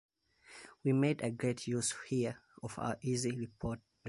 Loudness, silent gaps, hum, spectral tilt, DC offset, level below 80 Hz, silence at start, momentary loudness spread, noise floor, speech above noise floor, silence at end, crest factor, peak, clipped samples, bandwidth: -36 LUFS; none; none; -5.5 dB/octave; under 0.1%; -64 dBFS; 0.5 s; 15 LU; -60 dBFS; 24 dB; 0 s; 18 dB; -18 dBFS; under 0.1%; 11.5 kHz